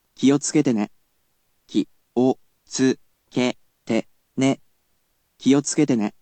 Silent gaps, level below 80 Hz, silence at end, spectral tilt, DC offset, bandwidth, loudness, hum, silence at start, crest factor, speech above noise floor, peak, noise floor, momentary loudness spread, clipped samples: none; -70 dBFS; 0.1 s; -5 dB/octave; under 0.1%; 9 kHz; -23 LUFS; none; 0.2 s; 18 dB; 49 dB; -6 dBFS; -69 dBFS; 12 LU; under 0.1%